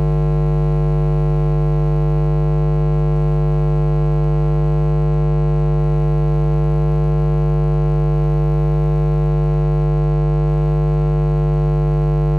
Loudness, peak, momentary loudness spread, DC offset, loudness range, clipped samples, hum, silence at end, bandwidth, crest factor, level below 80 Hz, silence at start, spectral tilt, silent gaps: -17 LUFS; -12 dBFS; 0 LU; under 0.1%; 0 LU; under 0.1%; 50 Hz at -15 dBFS; 0 s; 4.2 kHz; 4 dB; -20 dBFS; 0 s; -11 dB/octave; none